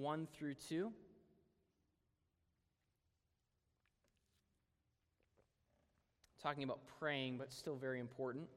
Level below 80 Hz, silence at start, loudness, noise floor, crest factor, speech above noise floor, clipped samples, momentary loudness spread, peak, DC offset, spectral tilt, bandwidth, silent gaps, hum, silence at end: -84 dBFS; 0 s; -46 LUFS; -87 dBFS; 24 dB; 41 dB; under 0.1%; 5 LU; -28 dBFS; under 0.1%; -5.5 dB/octave; 15 kHz; none; none; 0 s